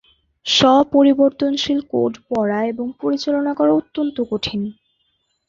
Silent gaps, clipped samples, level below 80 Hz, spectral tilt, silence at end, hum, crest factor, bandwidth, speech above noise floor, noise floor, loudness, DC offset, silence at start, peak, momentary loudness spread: none; under 0.1%; -54 dBFS; -4.5 dB/octave; 0.75 s; none; 16 dB; 7.6 kHz; 50 dB; -68 dBFS; -18 LUFS; under 0.1%; 0.45 s; -2 dBFS; 11 LU